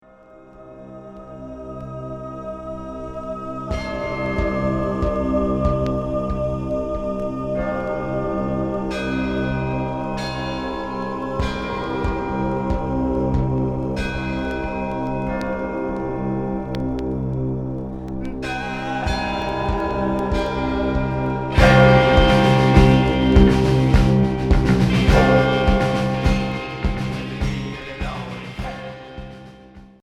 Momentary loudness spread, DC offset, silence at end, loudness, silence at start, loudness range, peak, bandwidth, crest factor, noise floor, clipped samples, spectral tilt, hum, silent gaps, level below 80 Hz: 17 LU; under 0.1%; 0.15 s; -21 LUFS; 0.35 s; 11 LU; 0 dBFS; 11.5 kHz; 20 dB; -46 dBFS; under 0.1%; -7 dB/octave; none; none; -28 dBFS